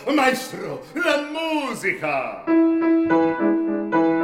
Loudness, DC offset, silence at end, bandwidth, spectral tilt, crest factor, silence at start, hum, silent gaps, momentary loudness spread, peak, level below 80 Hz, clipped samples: -21 LUFS; under 0.1%; 0 s; 15.5 kHz; -5 dB/octave; 16 dB; 0 s; none; none; 8 LU; -6 dBFS; -62 dBFS; under 0.1%